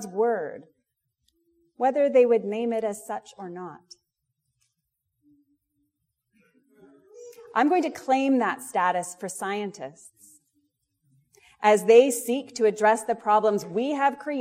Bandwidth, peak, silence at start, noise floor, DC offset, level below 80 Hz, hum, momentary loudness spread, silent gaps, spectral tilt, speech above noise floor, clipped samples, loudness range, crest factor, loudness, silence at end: 16 kHz; -4 dBFS; 0 s; -80 dBFS; under 0.1%; -78 dBFS; none; 17 LU; none; -4 dB/octave; 56 dB; under 0.1%; 12 LU; 22 dB; -24 LUFS; 0 s